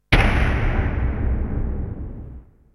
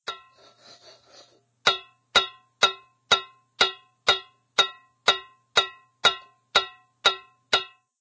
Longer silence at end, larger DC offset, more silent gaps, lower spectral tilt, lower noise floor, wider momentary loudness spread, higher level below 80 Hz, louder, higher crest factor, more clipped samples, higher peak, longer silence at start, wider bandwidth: about the same, 0.3 s vs 0.35 s; neither; neither; first, -6.5 dB/octave vs 0 dB/octave; second, -40 dBFS vs -56 dBFS; first, 17 LU vs 13 LU; first, -24 dBFS vs -62 dBFS; about the same, -23 LUFS vs -24 LUFS; about the same, 18 dB vs 20 dB; neither; first, -4 dBFS vs -8 dBFS; about the same, 0.1 s vs 0.1 s; first, 11.5 kHz vs 8 kHz